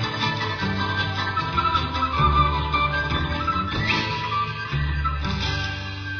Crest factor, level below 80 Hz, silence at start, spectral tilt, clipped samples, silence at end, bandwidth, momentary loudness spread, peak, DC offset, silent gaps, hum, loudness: 18 dB; -32 dBFS; 0 s; -5.5 dB/octave; under 0.1%; 0 s; 5.4 kHz; 5 LU; -6 dBFS; under 0.1%; none; none; -23 LUFS